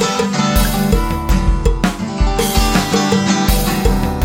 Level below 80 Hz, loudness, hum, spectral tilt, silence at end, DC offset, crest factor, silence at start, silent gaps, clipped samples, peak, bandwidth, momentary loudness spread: -18 dBFS; -15 LUFS; none; -5 dB/octave; 0 s; under 0.1%; 14 dB; 0 s; none; under 0.1%; 0 dBFS; 17 kHz; 3 LU